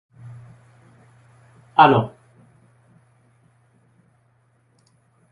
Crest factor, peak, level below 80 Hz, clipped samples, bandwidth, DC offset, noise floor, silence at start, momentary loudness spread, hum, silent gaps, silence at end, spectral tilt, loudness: 26 dB; 0 dBFS; -64 dBFS; under 0.1%; 11 kHz; under 0.1%; -62 dBFS; 1.8 s; 29 LU; none; none; 3.25 s; -8 dB/octave; -17 LUFS